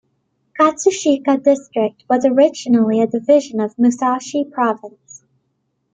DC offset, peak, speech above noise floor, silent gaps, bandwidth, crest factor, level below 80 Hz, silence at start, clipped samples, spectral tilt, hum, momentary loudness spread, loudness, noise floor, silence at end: under 0.1%; -2 dBFS; 53 dB; none; 9.2 kHz; 16 dB; -64 dBFS; 0.55 s; under 0.1%; -5 dB/octave; none; 7 LU; -16 LUFS; -69 dBFS; 1.05 s